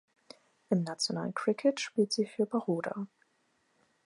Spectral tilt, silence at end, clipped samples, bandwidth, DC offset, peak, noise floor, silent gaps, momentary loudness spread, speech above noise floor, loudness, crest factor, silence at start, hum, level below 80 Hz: -5 dB/octave; 1 s; under 0.1%; 11.5 kHz; under 0.1%; -14 dBFS; -74 dBFS; none; 7 LU; 42 dB; -32 LUFS; 20 dB; 0.7 s; none; -86 dBFS